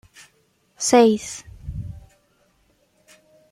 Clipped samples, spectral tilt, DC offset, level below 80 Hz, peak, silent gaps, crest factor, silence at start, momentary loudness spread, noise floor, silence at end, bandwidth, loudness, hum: under 0.1%; -4 dB/octave; under 0.1%; -48 dBFS; -2 dBFS; none; 22 dB; 0.8 s; 21 LU; -63 dBFS; 1.55 s; 15 kHz; -18 LUFS; none